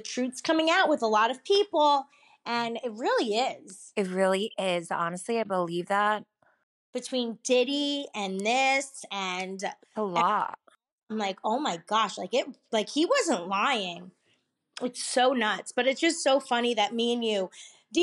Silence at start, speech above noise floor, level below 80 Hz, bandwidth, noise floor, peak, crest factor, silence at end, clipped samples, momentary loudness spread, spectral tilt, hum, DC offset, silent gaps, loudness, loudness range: 0 s; 44 dB; -82 dBFS; 12 kHz; -72 dBFS; -12 dBFS; 16 dB; 0 s; under 0.1%; 11 LU; -3 dB/octave; none; under 0.1%; 6.63-6.93 s, 10.92-10.98 s; -27 LUFS; 3 LU